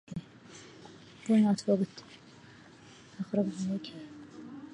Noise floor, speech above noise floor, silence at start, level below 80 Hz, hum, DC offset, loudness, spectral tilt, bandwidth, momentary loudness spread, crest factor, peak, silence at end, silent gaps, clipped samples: -54 dBFS; 25 dB; 0.1 s; -70 dBFS; none; under 0.1%; -31 LUFS; -7 dB/octave; 10.5 kHz; 27 LU; 18 dB; -16 dBFS; 0 s; none; under 0.1%